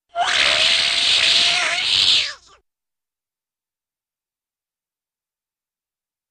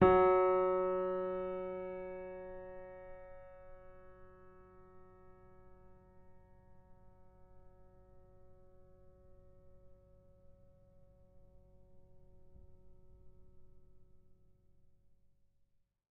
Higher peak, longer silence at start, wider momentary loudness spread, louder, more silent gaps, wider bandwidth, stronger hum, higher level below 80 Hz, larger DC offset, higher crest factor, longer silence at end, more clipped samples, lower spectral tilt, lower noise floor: first, -4 dBFS vs -14 dBFS; first, 0.15 s vs 0 s; second, 4 LU vs 31 LU; first, -14 LUFS vs -35 LUFS; neither; first, 15.5 kHz vs 4 kHz; neither; about the same, -58 dBFS vs -62 dBFS; neither; second, 18 dB vs 26 dB; first, 3.95 s vs 1.95 s; neither; second, 1 dB/octave vs -6.5 dB/octave; first, under -90 dBFS vs -74 dBFS